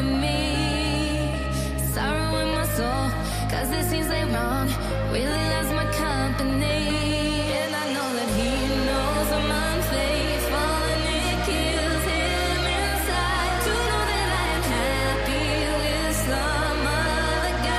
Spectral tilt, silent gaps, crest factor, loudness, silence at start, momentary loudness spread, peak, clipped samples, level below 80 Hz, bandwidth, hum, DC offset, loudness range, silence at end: -4.5 dB/octave; none; 12 dB; -24 LUFS; 0 s; 2 LU; -12 dBFS; under 0.1%; -30 dBFS; 15.5 kHz; none; under 0.1%; 2 LU; 0 s